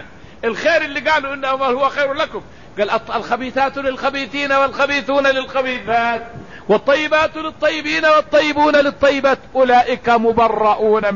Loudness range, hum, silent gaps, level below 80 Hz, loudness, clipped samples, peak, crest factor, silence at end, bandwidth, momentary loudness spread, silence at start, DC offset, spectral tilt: 5 LU; none; none; -48 dBFS; -16 LUFS; under 0.1%; -4 dBFS; 14 dB; 0 s; 7.4 kHz; 8 LU; 0 s; 0.8%; -4 dB/octave